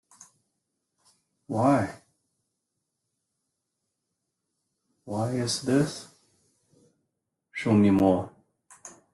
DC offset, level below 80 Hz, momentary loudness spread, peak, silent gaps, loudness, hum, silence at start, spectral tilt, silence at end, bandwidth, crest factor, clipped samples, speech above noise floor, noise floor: under 0.1%; -64 dBFS; 21 LU; -8 dBFS; none; -25 LUFS; none; 1.5 s; -6 dB/octave; 0.25 s; 12.5 kHz; 22 dB; under 0.1%; 58 dB; -82 dBFS